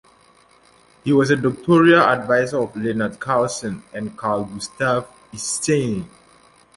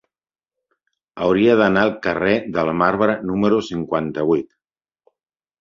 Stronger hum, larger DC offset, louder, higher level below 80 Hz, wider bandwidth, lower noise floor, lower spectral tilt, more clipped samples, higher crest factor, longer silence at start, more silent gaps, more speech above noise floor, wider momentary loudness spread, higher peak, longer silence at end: neither; neither; about the same, -19 LUFS vs -18 LUFS; about the same, -54 dBFS vs -52 dBFS; first, 11.5 kHz vs 7.4 kHz; second, -53 dBFS vs under -90 dBFS; second, -5 dB/octave vs -7 dB/octave; neither; about the same, 18 dB vs 18 dB; about the same, 1.05 s vs 1.15 s; neither; second, 35 dB vs over 72 dB; first, 16 LU vs 8 LU; about the same, -2 dBFS vs -2 dBFS; second, 0.7 s vs 1.15 s